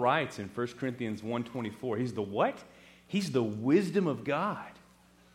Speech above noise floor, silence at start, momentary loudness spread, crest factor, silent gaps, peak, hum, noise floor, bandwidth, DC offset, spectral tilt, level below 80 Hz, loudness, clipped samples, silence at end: 29 dB; 0 s; 9 LU; 18 dB; none; -14 dBFS; none; -61 dBFS; 16 kHz; under 0.1%; -6.5 dB/octave; -70 dBFS; -32 LUFS; under 0.1%; 0.55 s